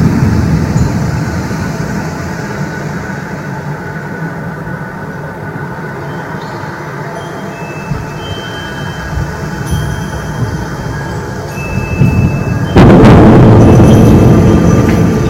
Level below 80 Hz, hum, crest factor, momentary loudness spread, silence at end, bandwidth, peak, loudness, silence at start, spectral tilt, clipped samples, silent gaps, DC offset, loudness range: -24 dBFS; none; 10 dB; 17 LU; 0 s; 16 kHz; 0 dBFS; -11 LUFS; 0 s; -7.5 dB/octave; 2%; none; under 0.1%; 15 LU